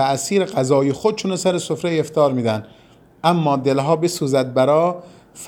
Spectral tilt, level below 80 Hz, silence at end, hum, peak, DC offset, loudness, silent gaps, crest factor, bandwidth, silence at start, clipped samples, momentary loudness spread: -5.5 dB/octave; -60 dBFS; 0 s; none; -2 dBFS; under 0.1%; -19 LUFS; none; 16 dB; 18.5 kHz; 0 s; under 0.1%; 5 LU